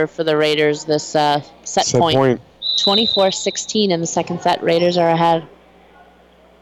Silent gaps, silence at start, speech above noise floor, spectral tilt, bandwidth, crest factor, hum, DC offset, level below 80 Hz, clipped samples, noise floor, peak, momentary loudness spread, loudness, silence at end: none; 0 s; 32 dB; -4 dB/octave; 14.5 kHz; 12 dB; none; under 0.1%; -54 dBFS; under 0.1%; -49 dBFS; -4 dBFS; 7 LU; -16 LUFS; 1.15 s